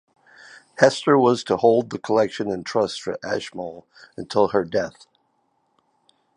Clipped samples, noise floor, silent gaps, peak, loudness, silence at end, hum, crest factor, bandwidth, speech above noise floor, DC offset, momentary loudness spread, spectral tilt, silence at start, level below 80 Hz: under 0.1%; -68 dBFS; none; 0 dBFS; -21 LUFS; 1.45 s; none; 22 dB; 10.5 kHz; 47 dB; under 0.1%; 16 LU; -5 dB/octave; 0.8 s; -62 dBFS